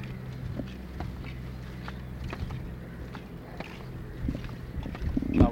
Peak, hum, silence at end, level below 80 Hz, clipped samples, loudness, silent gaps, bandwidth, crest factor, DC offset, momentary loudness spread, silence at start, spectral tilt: -6 dBFS; none; 0 s; -38 dBFS; under 0.1%; -36 LUFS; none; 16.5 kHz; 26 dB; under 0.1%; 8 LU; 0 s; -8 dB/octave